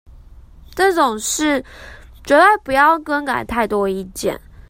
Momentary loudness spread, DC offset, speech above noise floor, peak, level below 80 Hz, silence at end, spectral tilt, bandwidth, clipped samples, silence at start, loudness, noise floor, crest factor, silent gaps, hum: 12 LU; under 0.1%; 25 dB; 0 dBFS; -42 dBFS; 0.3 s; -3 dB/octave; 16.5 kHz; under 0.1%; 0.1 s; -16 LUFS; -41 dBFS; 18 dB; none; none